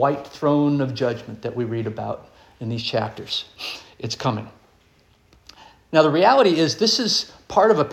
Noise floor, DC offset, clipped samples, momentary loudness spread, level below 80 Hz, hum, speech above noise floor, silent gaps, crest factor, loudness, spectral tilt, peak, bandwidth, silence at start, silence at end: -57 dBFS; under 0.1%; under 0.1%; 16 LU; -58 dBFS; none; 37 dB; none; 20 dB; -21 LUFS; -5 dB/octave; -2 dBFS; 14 kHz; 0 s; 0 s